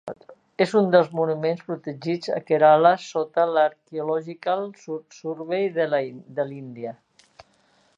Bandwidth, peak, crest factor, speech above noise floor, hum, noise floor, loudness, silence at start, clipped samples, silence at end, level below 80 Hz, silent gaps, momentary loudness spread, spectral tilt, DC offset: 9.6 kHz; -2 dBFS; 20 dB; 40 dB; none; -62 dBFS; -23 LUFS; 0.05 s; under 0.1%; 1.05 s; -76 dBFS; none; 17 LU; -6.5 dB/octave; under 0.1%